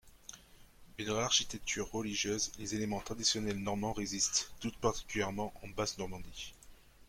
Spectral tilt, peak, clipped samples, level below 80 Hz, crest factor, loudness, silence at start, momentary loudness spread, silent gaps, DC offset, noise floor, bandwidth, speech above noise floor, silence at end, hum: -2.5 dB/octave; -16 dBFS; under 0.1%; -56 dBFS; 22 dB; -35 LUFS; 0.05 s; 16 LU; none; under 0.1%; -58 dBFS; 16.5 kHz; 22 dB; 0.05 s; none